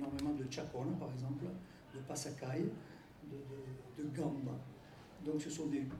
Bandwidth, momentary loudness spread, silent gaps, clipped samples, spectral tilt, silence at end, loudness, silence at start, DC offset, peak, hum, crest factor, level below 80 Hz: 15.5 kHz; 13 LU; none; under 0.1%; -6 dB/octave; 0 s; -44 LUFS; 0 s; under 0.1%; -26 dBFS; none; 16 dB; -68 dBFS